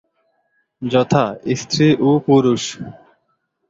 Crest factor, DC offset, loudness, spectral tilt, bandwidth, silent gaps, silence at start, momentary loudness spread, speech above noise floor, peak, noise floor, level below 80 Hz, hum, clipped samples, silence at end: 16 dB; under 0.1%; -16 LUFS; -6 dB/octave; 8 kHz; none; 0.8 s; 15 LU; 53 dB; -2 dBFS; -68 dBFS; -54 dBFS; none; under 0.1%; 0.75 s